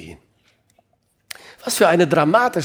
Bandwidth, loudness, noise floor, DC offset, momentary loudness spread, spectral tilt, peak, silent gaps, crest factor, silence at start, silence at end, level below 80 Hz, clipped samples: over 20 kHz; -16 LUFS; -66 dBFS; under 0.1%; 23 LU; -4.5 dB/octave; -2 dBFS; none; 18 dB; 0 s; 0 s; -62 dBFS; under 0.1%